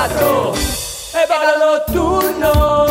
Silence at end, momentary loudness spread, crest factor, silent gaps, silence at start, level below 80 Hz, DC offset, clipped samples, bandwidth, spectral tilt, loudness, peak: 0 s; 6 LU; 14 dB; none; 0 s; -26 dBFS; under 0.1%; under 0.1%; 16.5 kHz; -4.5 dB/octave; -15 LUFS; -2 dBFS